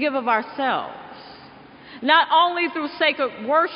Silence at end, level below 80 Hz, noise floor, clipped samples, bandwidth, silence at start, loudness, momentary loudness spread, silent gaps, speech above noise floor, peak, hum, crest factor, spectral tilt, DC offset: 0 s; -68 dBFS; -45 dBFS; under 0.1%; 5.4 kHz; 0 s; -20 LUFS; 19 LU; none; 24 dB; -4 dBFS; none; 18 dB; 0.5 dB/octave; under 0.1%